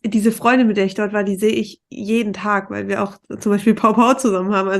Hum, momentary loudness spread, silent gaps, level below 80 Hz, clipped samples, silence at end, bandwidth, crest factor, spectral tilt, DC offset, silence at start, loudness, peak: none; 9 LU; none; -60 dBFS; under 0.1%; 0 s; 12.5 kHz; 16 dB; -5.5 dB/octave; under 0.1%; 0.05 s; -18 LUFS; -2 dBFS